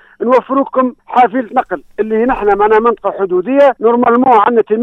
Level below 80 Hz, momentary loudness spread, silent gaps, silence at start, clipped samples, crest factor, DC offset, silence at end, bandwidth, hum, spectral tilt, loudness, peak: -42 dBFS; 8 LU; none; 0.2 s; under 0.1%; 12 dB; under 0.1%; 0 s; 6.2 kHz; none; -7.5 dB/octave; -12 LUFS; 0 dBFS